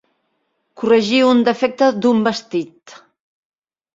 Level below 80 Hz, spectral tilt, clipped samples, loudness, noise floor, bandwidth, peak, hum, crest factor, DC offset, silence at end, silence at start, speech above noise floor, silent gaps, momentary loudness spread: -64 dBFS; -5 dB/octave; under 0.1%; -16 LUFS; -69 dBFS; 7.8 kHz; -2 dBFS; none; 16 dB; under 0.1%; 1.05 s; 0.8 s; 53 dB; none; 12 LU